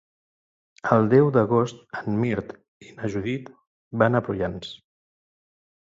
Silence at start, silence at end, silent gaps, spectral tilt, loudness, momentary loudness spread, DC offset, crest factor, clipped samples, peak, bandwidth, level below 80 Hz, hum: 0.85 s; 1.1 s; 2.68-2.81 s, 3.67-3.91 s; -8 dB/octave; -23 LUFS; 16 LU; under 0.1%; 22 dB; under 0.1%; -2 dBFS; 7.8 kHz; -56 dBFS; none